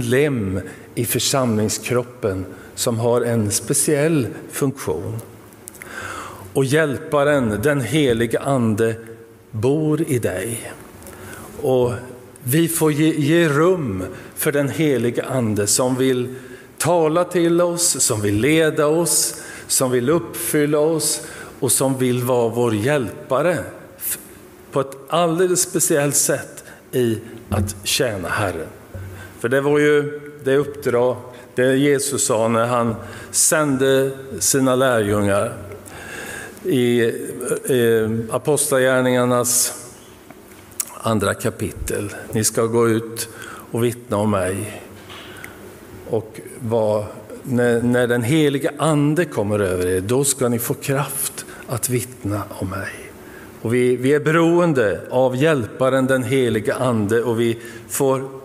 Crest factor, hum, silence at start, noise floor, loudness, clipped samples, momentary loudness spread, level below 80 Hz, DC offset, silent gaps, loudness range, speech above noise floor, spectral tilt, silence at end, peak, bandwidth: 18 dB; none; 0 s; -42 dBFS; -19 LUFS; under 0.1%; 15 LU; -50 dBFS; under 0.1%; none; 5 LU; 24 dB; -4.5 dB/octave; 0 s; -2 dBFS; 16 kHz